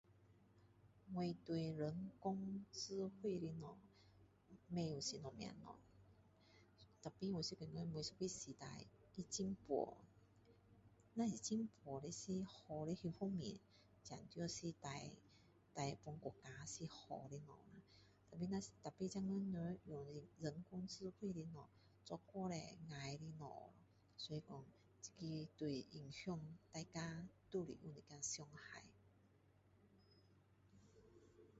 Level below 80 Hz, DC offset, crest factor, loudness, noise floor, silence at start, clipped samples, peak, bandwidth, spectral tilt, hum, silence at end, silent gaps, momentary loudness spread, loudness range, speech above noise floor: -76 dBFS; under 0.1%; 20 dB; -50 LUFS; -74 dBFS; 0.1 s; under 0.1%; -30 dBFS; 7.6 kHz; -6 dB/octave; none; 0 s; none; 16 LU; 5 LU; 25 dB